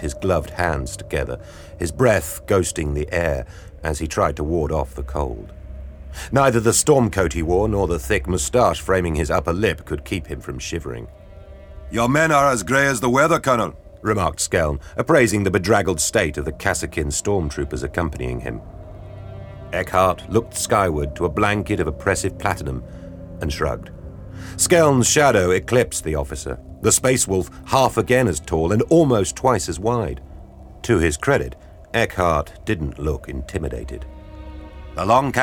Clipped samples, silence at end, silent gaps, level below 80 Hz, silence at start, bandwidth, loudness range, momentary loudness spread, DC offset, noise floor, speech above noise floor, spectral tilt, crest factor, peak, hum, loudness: under 0.1%; 0 s; none; -34 dBFS; 0 s; over 20 kHz; 6 LU; 19 LU; under 0.1%; -40 dBFS; 21 dB; -4.5 dB/octave; 18 dB; -2 dBFS; none; -20 LUFS